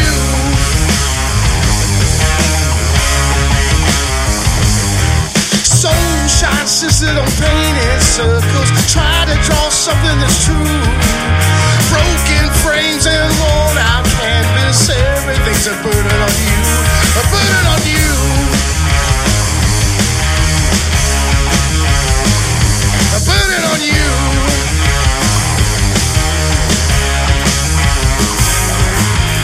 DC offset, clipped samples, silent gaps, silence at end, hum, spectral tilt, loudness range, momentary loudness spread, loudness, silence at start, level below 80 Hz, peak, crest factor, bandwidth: under 0.1%; under 0.1%; none; 0 s; none; -3.5 dB/octave; 1 LU; 2 LU; -11 LUFS; 0 s; -16 dBFS; 0 dBFS; 12 dB; 16 kHz